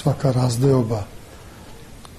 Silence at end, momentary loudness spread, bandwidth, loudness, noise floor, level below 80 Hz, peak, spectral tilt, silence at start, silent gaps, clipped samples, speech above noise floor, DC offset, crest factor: 0 s; 24 LU; 13.5 kHz; -20 LUFS; -41 dBFS; -46 dBFS; -6 dBFS; -7 dB/octave; 0 s; none; under 0.1%; 22 dB; 0.1%; 16 dB